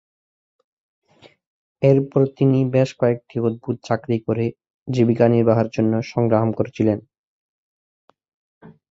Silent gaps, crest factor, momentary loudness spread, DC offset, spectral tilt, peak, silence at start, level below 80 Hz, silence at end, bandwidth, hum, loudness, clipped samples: 4.70-4.86 s, 7.18-8.08 s, 8.34-8.61 s; 18 dB; 8 LU; under 0.1%; -9 dB/octave; -2 dBFS; 1.8 s; -56 dBFS; 0.2 s; 7.6 kHz; none; -20 LUFS; under 0.1%